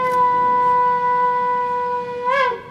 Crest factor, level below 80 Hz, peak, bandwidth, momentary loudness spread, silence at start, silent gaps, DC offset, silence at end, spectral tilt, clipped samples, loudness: 12 dB; -58 dBFS; -6 dBFS; 10 kHz; 6 LU; 0 s; none; under 0.1%; 0 s; -5 dB/octave; under 0.1%; -18 LUFS